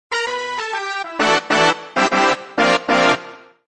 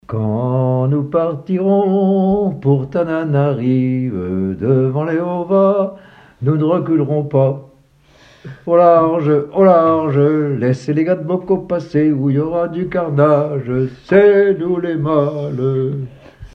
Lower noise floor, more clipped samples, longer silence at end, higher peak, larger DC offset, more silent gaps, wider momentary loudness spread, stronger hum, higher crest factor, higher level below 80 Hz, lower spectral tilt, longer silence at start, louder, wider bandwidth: second, -38 dBFS vs -50 dBFS; neither; first, 0.3 s vs 0.1 s; about the same, -2 dBFS vs 0 dBFS; neither; neither; about the same, 8 LU vs 9 LU; neither; about the same, 16 dB vs 14 dB; second, -62 dBFS vs -50 dBFS; second, -3 dB/octave vs -10 dB/octave; about the same, 0.1 s vs 0.1 s; about the same, -17 LUFS vs -15 LUFS; first, 9.6 kHz vs 6.4 kHz